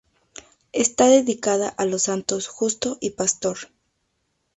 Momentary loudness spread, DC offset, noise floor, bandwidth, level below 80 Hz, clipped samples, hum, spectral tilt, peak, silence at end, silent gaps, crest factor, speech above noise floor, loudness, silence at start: 11 LU; under 0.1%; -72 dBFS; 8.2 kHz; -60 dBFS; under 0.1%; none; -3 dB/octave; -4 dBFS; 0.9 s; none; 20 dB; 51 dB; -21 LUFS; 0.75 s